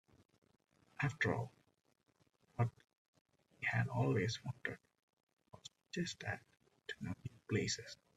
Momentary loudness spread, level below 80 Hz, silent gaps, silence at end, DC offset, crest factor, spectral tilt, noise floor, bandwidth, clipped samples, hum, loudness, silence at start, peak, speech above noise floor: 16 LU; -72 dBFS; 2.98-3.13 s, 3.21-3.25 s, 5.03-5.17 s, 5.23-5.27 s, 5.33-5.37 s; 0.25 s; under 0.1%; 22 dB; -5 dB/octave; -76 dBFS; 11 kHz; under 0.1%; none; -41 LUFS; 1 s; -22 dBFS; 36 dB